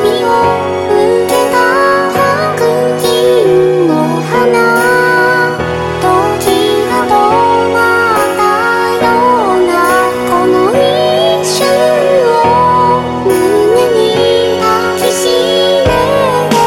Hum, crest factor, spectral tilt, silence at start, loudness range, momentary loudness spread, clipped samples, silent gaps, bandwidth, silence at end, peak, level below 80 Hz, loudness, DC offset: none; 10 dB; -4.5 dB/octave; 0 s; 1 LU; 3 LU; under 0.1%; none; 19 kHz; 0 s; 0 dBFS; -38 dBFS; -9 LUFS; under 0.1%